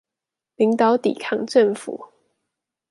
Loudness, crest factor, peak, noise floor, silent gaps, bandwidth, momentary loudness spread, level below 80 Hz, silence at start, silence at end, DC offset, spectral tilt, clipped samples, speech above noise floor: -20 LUFS; 18 dB; -4 dBFS; -87 dBFS; none; 11.5 kHz; 14 LU; -72 dBFS; 0.6 s; 0.85 s; under 0.1%; -5.5 dB/octave; under 0.1%; 67 dB